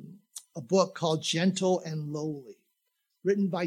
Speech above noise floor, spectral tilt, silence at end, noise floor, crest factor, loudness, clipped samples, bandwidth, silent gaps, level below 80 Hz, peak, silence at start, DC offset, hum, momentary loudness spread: 51 dB; -5 dB/octave; 0 s; -79 dBFS; 20 dB; -29 LUFS; under 0.1%; 13.5 kHz; none; -84 dBFS; -10 dBFS; 0 s; under 0.1%; none; 17 LU